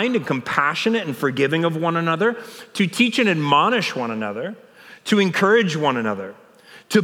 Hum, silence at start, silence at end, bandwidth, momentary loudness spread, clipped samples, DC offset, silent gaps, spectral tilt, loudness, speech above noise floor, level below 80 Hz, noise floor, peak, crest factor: none; 0 s; 0 s; 16.5 kHz; 13 LU; under 0.1%; under 0.1%; none; -5 dB/octave; -20 LUFS; 27 dB; -72 dBFS; -47 dBFS; -2 dBFS; 20 dB